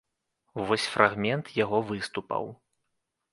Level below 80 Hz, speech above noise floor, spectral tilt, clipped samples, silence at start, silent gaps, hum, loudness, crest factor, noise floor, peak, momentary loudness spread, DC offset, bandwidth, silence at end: -64 dBFS; 53 dB; -5 dB/octave; under 0.1%; 0.55 s; none; none; -28 LUFS; 28 dB; -80 dBFS; -2 dBFS; 12 LU; under 0.1%; 11.5 kHz; 0.8 s